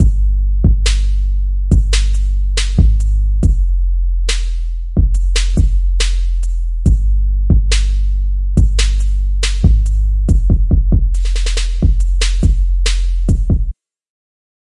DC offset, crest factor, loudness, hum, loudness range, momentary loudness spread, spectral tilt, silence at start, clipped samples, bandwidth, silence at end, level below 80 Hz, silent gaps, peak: under 0.1%; 12 dB; -16 LUFS; none; 2 LU; 5 LU; -5 dB/octave; 0 s; under 0.1%; 11 kHz; 1 s; -12 dBFS; none; 0 dBFS